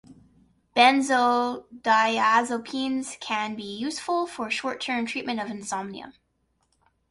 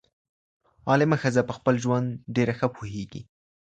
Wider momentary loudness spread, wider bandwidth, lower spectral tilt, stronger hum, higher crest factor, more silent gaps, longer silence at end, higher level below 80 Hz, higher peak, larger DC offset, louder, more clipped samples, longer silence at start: about the same, 13 LU vs 14 LU; first, 11.5 kHz vs 9 kHz; second, -2.5 dB/octave vs -7 dB/octave; neither; about the same, 20 dB vs 20 dB; neither; first, 1 s vs 0.55 s; second, -68 dBFS vs -58 dBFS; about the same, -6 dBFS vs -6 dBFS; neither; about the same, -25 LUFS vs -25 LUFS; neither; second, 0.1 s vs 0.85 s